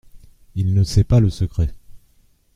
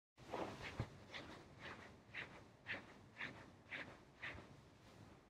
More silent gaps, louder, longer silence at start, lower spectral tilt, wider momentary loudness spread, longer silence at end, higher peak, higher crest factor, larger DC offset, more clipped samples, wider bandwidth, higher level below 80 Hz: neither; first, -19 LUFS vs -53 LUFS; about the same, 0.15 s vs 0.15 s; first, -7.5 dB/octave vs -5 dB/octave; about the same, 10 LU vs 12 LU; first, 0.6 s vs 0 s; first, -4 dBFS vs -32 dBFS; second, 16 dB vs 22 dB; neither; neither; second, 11 kHz vs 15 kHz; first, -32 dBFS vs -70 dBFS